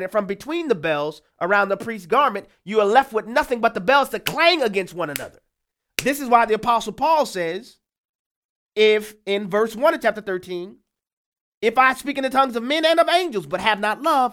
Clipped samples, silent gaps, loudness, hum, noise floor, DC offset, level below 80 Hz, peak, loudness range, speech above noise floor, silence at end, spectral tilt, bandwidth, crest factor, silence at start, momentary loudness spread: under 0.1%; 7.98-8.67 s, 11.13-11.32 s, 11.41-11.61 s; -20 LUFS; none; -79 dBFS; under 0.1%; -58 dBFS; -2 dBFS; 3 LU; 59 dB; 0 s; -3.5 dB/octave; 18.5 kHz; 20 dB; 0 s; 11 LU